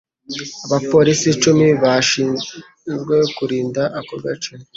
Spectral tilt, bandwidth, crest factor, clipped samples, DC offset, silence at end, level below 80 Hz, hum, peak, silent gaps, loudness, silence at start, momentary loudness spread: -4.5 dB/octave; 8 kHz; 16 dB; under 0.1%; under 0.1%; 0.15 s; -54 dBFS; none; -2 dBFS; none; -17 LUFS; 0.3 s; 15 LU